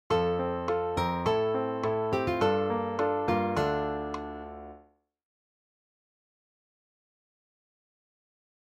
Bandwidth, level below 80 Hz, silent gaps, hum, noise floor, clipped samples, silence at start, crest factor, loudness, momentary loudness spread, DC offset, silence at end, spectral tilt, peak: 14 kHz; -54 dBFS; none; none; -61 dBFS; under 0.1%; 0.1 s; 20 dB; -29 LUFS; 12 LU; under 0.1%; 3.9 s; -6.5 dB/octave; -12 dBFS